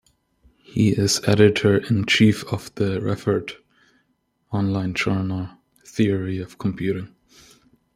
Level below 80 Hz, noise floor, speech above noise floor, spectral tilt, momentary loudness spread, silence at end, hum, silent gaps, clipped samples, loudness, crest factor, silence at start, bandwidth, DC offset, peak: -54 dBFS; -69 dBFS; 48 dB; -5.5 dB/octave; 14 LU; 0.9 s; none; none; under 0.1%; -21 LUFS; 20 dB; 0.7 s; 15 kHz; under 0.1%; -2 dBFS